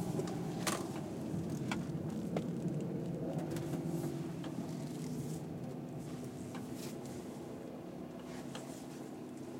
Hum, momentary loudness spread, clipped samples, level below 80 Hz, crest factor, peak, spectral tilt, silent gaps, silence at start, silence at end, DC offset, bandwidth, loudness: none; 8 LU; under 0.1%; -66 dBFS; 20 dB; -20 dBFS; -6 dB/octave; none; 0 s; 0 s; under 0.1%; 16.5 kHz; -42 LUFS